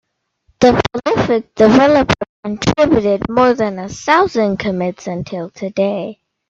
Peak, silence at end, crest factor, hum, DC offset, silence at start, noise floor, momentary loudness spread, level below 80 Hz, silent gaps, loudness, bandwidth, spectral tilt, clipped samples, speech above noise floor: 0 dBFS; 0.35 s; 14 dB; none; under 0.1%; 0.6 s; -60 dBFS; 13 LU; -40 dBFS; 2.29-2.43 s; -15 LUFS; 7.8 kHz; -6 dB/octave; under 0.1%; 46 dB